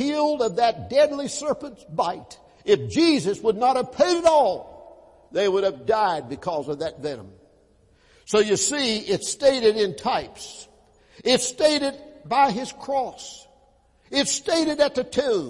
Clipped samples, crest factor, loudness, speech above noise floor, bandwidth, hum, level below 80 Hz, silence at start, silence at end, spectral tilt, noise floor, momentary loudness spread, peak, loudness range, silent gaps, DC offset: under 0.1%; 18 dB; -22 LUFS; 37 dB; 11.5 kHz; none; -58 dBFS; 0 s; 0 s; -3.5 dB/octave; -59 dBFS; 13 LU; -6 dBFS; 4 LU; none; under 0.1%